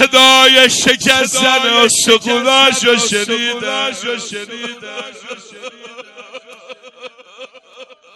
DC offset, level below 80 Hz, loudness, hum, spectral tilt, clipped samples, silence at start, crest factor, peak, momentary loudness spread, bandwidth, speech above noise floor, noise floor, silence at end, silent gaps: under 0.1%; -54 dBFS; -10 LUFS; none; -1 dB/octave; 0.6%; 0 s; 14 dB; 0 dBFS; 23 LU; over 20 kHz; 26 dB; -40 dBFS; 0.3 s; none